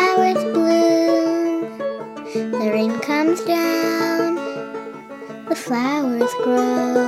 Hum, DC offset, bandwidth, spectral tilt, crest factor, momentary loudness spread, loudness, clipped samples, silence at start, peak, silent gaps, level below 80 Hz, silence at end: none; under 0.1%; 15 kHz; -4.5 dB/octave; 16 dB; 14 LU; -19 LUFS; under 0.1%; 0 s; -4 dBFS; none; -70 dBFS; 0 s